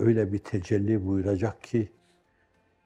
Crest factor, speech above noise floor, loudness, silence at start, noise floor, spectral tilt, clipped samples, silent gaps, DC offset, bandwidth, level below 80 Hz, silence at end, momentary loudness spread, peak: 18 dB; 41 dB; -28 LUFS; 0 s; -67 dBFS; -9 dB/octave; under 0.1%; none; under 0.1%; 8.8 kHz; -62 dBFS; 1 s; 5 LU; -10 dBFS